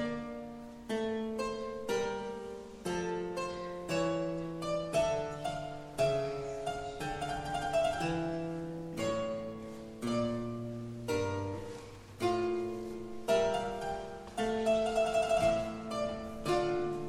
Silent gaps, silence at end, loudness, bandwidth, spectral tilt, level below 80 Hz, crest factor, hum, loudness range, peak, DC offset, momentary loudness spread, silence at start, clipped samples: none; 0 s; -35 LUFS; 15.5 kHz; -5.5 dB/octave; -56 dBFS; 16 dB; none; 5 LU; -18 dBFS; under 0.1%; 11 LU; 0 s; under 0.1%